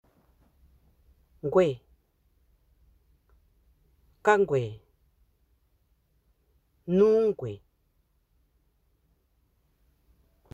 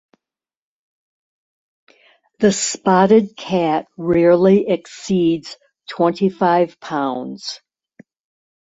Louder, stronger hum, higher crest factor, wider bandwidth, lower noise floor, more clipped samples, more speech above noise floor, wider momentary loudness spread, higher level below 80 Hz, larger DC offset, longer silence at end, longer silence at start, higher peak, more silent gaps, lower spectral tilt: second, -26 LUFS vs -17 LUFS; neither; first, 24 dB vs 18 dB; about the same, 8.2 kHz vs 8 kHz; second, -70 dBFS vs -88 dBFS; neither; second, 47 dB vs 72 dB; first, 21 LU vs 16 LU; about the same, -62 dBFS vs -58 dBFS; neither; first, 2.95 s vs 1.15 s; second, 1.45 s vs 2.4 s; second, -8 dBFS vs -2 dBFS; neither; first, -7 dB/octave vs -5.5 dB/octave